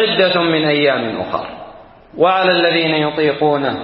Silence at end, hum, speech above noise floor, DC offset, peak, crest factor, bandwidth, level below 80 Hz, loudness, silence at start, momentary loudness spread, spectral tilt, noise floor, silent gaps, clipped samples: 0 s; none; 24 dB; under 0.1%; -2 dBFS; 14 dB; 5.6 kHz; -54 dBFS; -15 LUFS; 0 s; 10 LU; -10.5 dB/octave; -39 dBFS; none; under 0.1%